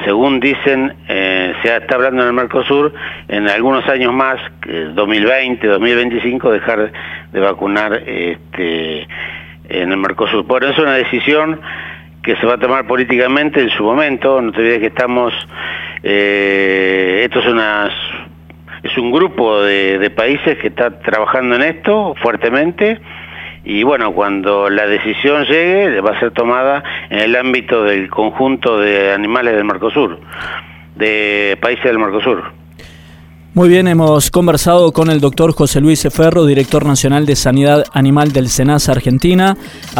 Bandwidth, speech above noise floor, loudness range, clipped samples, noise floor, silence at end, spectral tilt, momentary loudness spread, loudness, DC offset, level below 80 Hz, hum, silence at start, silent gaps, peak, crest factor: 17.5 kHz; 25 dB; 4 LU; under 0.1%; -37 dBFS; 0 s; -5 dB/octave; 10 LU; -12 LUFS; under 0.1%; -38 dBFS; none; 0 s; none; 0 dBFS; 12 dB